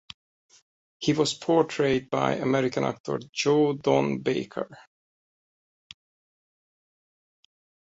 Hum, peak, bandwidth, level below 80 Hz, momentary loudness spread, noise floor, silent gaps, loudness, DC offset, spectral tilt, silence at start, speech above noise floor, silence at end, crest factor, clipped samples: none; -6 dBFS; 8.2 kHz; -64 dBFS; 9 LU; under -90 dBFS; 3.00-3.04 s, 3.29-3.33 s; -26 LUFS; under 0.1%; -5.5 dB/octave; 1 s; over 65 dB; 3.15 s; 22 dB; under 0.1%